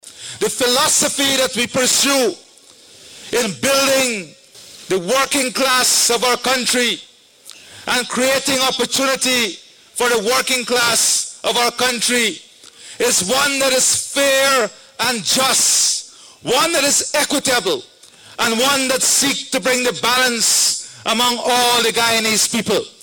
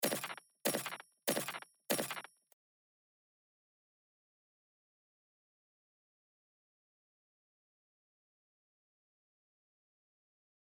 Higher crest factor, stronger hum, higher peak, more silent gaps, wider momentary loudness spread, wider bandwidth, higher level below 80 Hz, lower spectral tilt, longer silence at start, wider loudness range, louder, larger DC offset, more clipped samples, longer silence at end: second, 12 dB vs 26 dB; neither; first, -4 dBFS vs -20 dBFS; neither; about the same, 9 LU vs 9 LU; second, 18 kHz vs over 20 kHz; first, -56 dBFS vs under -90 dBFS; about the same, -1 dB/octave vs -2 dB/octave; about the same, 0.05 s vs 0 s; about the same, 3 LU vs 5 LU; first, -15 LUFS vs -39 LUFS; neither; neither; second, 0.1 s vs 8.5 s